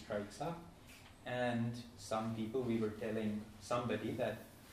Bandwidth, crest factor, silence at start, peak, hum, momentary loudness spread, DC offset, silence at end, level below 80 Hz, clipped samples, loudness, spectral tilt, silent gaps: 15.5 kHz; 16 dB; 0 s; -24 dBFS; none; 13 LU; under 0.1%; 0 s; -66 dBFS; under 0.1%; -41 LUFS; -6 dB/octave; none